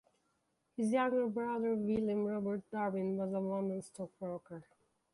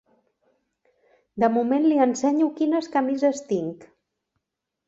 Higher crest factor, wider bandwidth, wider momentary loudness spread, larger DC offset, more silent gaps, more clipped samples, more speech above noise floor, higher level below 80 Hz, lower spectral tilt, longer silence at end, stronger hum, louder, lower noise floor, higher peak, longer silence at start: about the same, 16 dB vs 18 dB; first, 11.5 kHz vs 7.8 kHz; first, 13 LU vs 8 LU; neither; neither; neither; second, 44 dB vs 60 dB; second, -74 dBFS vs -68 dBFS; first, -7.5 dB/octave vs -5.5 dB/octave; second, 0.5 s vs 1 s; neither; second, -36 LUFS vs -22 LUFS; about the same, -80 dBFS vs -82 dBFS; second, -22 dBFS vs -8 dBFS; second, 0.8 s vs 1.35 s